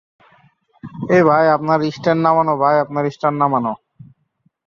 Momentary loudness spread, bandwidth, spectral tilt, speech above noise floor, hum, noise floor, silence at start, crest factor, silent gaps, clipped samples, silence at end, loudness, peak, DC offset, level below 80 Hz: 12 LU; 7.2 kHz; -8 dB/octave; 48 dB; none; -64 dBFS; 0.85 s; 16 dB; none; under 0.1%; 0.9 s; -16 LUFS; -2 dBFS; under 0.1%; -60 dBFS